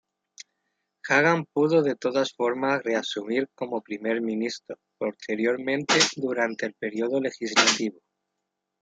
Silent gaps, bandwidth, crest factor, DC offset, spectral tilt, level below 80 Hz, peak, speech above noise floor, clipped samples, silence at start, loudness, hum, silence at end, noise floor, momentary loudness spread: none; 9.4 kHz; 22 dB; under 0.1%; -3 dB/octave; -76 dBFS; -4 dBFS; 57 dB; under 0.1%; 0.4 s; -25 LUFS; none; 0.9 s; -82 dBFS; 12 LU